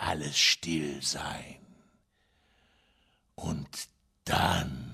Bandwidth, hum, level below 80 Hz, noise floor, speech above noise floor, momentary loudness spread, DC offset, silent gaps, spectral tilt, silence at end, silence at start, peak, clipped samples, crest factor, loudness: 15.5 kHz; none; -56 dBFS; -71 dBFS; 40 dB; 19 LU; under 0.1%; none; -2.5 dB/octave; 0 s; 0 s; -12 dBFS; under 0.1%; 22 dB; -29 LUFS